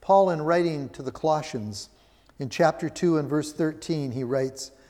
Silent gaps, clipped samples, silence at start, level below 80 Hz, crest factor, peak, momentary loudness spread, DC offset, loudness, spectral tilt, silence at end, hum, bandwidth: none; under 0.1%; 0 s; -60 dBFS; 18 dB; -8 dBFS; 13 LU; under 0.1%; -26 LUFS; -6 dB/octave; 0.2 s; none; 15.5 kHz